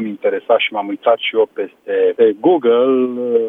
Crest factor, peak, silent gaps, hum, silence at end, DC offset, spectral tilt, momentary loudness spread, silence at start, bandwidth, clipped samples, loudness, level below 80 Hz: 14 dB; 0 dBFS; none; none; 0 s; under 0.1%; -7.5 dB/octave; 7 LU; 0 s; 3.8 kHz; under 0.1%; -15 LUFS; -76 dBFS